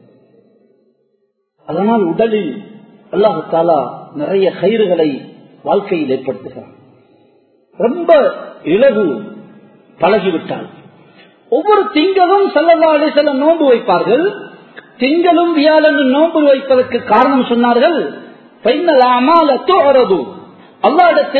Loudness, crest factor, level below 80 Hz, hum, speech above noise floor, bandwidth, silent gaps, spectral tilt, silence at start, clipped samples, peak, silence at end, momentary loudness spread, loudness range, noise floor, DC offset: -12 LUFS; 12 dB; -60 dBFS; none; 52 dB; 4.5 kHz; none; -8.5 dB/octave; 1.7 s; under 0.1%; 0 dBFS; 0 s; 14 LU; 5 LU; -63 dBFS; under 0.1%